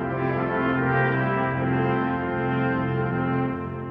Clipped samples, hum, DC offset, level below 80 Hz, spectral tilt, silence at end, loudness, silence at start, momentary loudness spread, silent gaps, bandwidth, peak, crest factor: under 0.1%; none; under 0.1%; -50 dBFS; -10.5 dB/octave; 0 s; -24 LUFS; 0 s; 4 LU; none; 5 kHz; -8 dBFS; 14 dB